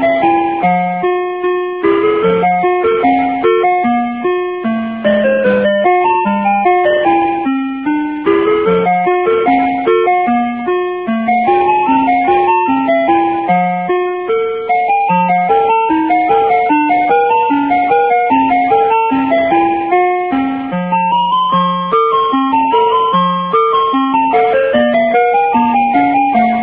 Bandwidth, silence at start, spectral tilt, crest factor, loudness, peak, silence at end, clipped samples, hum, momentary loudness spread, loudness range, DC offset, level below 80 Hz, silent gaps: 4 kHz; 0 s; -9.5 dB/octave; 12 dB; -12 LUFS; 0 dBFS; 0 s; under 0.1%; none; 5 LU; 2 LU; 0.2%; -48 dBFS; none